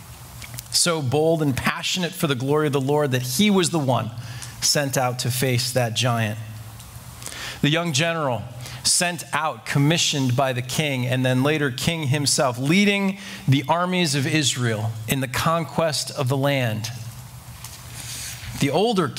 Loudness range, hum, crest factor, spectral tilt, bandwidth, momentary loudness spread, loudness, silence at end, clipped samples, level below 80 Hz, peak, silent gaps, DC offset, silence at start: 4 LU; none; 20 dB; -4 dB/octave; 16.5 kHz; 16 LU; -21 LUFS; 0 s; under 0.1%; -52 dBFS; -2 dBFS; none; under 0.1%; 0 s